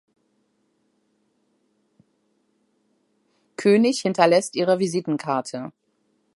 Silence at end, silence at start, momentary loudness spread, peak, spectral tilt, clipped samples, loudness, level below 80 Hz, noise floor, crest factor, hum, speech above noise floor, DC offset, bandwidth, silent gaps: 0.65 s; 3.6 s; 16 LU; -2 dBFS; -5 dB/octave; under 0.1%; -21 LUFS; -76 dBFS; -69 dBFS; 24 dB; none; 49 dB; under 0.1%; 11.5 kHz; none